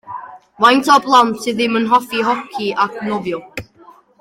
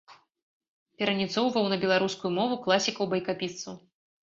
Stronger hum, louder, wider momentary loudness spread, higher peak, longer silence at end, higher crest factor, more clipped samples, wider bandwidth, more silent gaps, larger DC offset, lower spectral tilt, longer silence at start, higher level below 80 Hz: neither; first, -15 LUFS vs -27 LUFS; first, 19 LU vs 10 LU; first, 0 dBFS vs -6 dBFS; about the same, 0.55 s vs 0.45 s; second, 16 dB vs 22 dB; neither; first, 16.5 kHz vs 7.8 kHz; second, none vs 0.42-0.60 s, 0.68-0.86 s; neither; about the same, -4 dB/octave vs -4 dB/octave; about the same, 0.05 s vs 0.1 s; first, -58 dBFS vs -70 dBFS